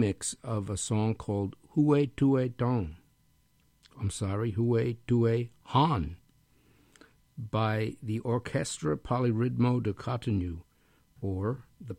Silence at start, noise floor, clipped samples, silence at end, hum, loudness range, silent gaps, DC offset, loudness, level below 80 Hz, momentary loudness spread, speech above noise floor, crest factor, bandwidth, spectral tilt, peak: 0 s; -68 dBFS; under 0.1%; 0.05 s; none; 3 LU; none; under 0.1%; -30 LUFS; -54 dBFS; 10 LU; 39 dB; 18 dB; 13 kHz; -6.5 dB/octave; -12 dBFS